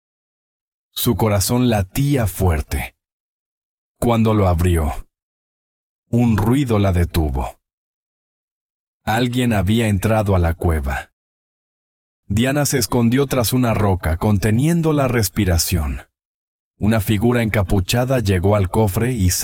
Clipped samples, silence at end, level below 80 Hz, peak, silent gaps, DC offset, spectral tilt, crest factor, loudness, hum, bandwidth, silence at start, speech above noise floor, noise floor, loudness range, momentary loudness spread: under 0.1%; 0 s; -32 dBFS; -4 dBFS; 3.13-3.95 s, 5.22-6.03 s, 7.73-9.00 s, 11.13-12.23 s, 16.25-16.74 s; under 0.1%; -5.5 dB/octave; 16 dB; -18 LUFS; none; 18 kHz; 0.95 s; over 73 dB; under -90 dBFS; 4 LU; 7 LU